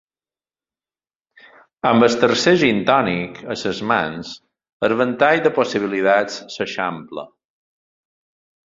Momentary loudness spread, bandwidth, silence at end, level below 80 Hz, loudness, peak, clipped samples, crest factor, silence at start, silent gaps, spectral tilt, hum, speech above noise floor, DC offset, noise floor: 15 LU; 7.8 kHz; 1.4 s; -58 dBFS; -18 LUFS; 0 dBFS; under 0.1%; 20 dB; 1.85 s; 4.73-4.80 s; -5 dB/octave; none; over 72 dB; under 0.1%; under -90 dBFS